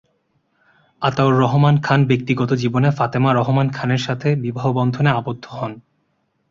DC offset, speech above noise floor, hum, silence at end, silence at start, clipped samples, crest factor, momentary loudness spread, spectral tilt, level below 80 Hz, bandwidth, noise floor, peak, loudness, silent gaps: under 0.1%; 50 dB; none; 0.7 s; 1 s; under 0.1%; 16 dB; 8 LU; -7.5 dB/octave; -52 dBFS; 7.2 kHz; -67 dBFS; -2 dBFS; -18 LUFS; none